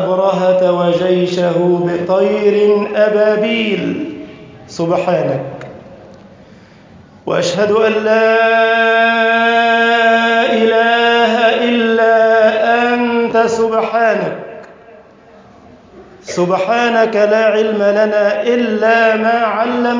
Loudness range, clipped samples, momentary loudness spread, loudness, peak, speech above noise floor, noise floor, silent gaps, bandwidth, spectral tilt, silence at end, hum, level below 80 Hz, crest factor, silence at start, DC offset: 8 LU; under 0.1%; 9 LU; -12 LUFS; -2 dBFS; 29 dB; -41 dBFS; none; 7.6 kHz; -5.5 dB/octave; 0 s; none; -56 dBFS; 12 dB; 0 s; under 0.1%